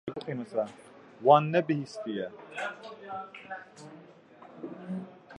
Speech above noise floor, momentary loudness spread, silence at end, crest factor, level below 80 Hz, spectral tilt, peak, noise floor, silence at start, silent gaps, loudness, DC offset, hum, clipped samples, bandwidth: 23 dB; 22 LU; 0 s; 26 dB; -78 dBFS; -7 dB/octave; -6 dBFS; -53 dBFS; 0.05 s; none; -30 LUFS; under 0.1%; none; under 0.1%; 11 kHz